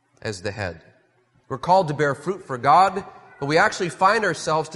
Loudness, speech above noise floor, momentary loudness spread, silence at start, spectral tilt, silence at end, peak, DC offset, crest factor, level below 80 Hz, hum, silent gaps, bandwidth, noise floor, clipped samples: -21 LUFS; 41 dB; 15 LU; 0.25 s; -4.5 dB/octave; 0 s; -4 dBFS; under 0.1%; 18 dB; -60 dBFS; none; none; 11.5 kHz; -62 dBFS; under 0.1%